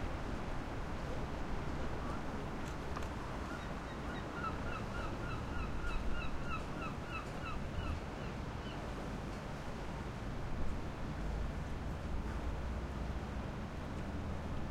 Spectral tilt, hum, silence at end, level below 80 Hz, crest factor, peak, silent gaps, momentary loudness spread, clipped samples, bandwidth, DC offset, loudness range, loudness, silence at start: -6.5 dB/octave; none; 0 s; -44 dBFS; 14 dB; -26 dBFS; none; 2 LU; under 0.1%; 14 kHz; under 0.1%; 2 LU; -43 LUFS; 0 s